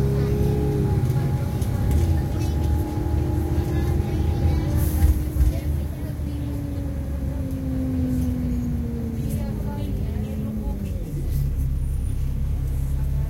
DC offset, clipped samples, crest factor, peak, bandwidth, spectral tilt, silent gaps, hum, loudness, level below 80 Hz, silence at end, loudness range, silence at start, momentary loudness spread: under 0.1%; under 0.1%; 16 dB; -6 dBFS; 16.5 kHz; -8 dB/octave; none; none; -25 LUFS; -26 dBFS; 0 s; 4 LU; 0 s; 7 LU